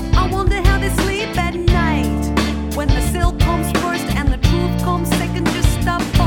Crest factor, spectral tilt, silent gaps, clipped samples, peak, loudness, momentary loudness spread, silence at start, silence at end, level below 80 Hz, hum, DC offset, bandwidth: 16 dB; -5.5 dB/octave; none; under 0.1%; 0 dBFS; -18 LUFS; 3 LU; 0 s; 0 s; -20 dBFS; none; under 0.1%; 18 kHz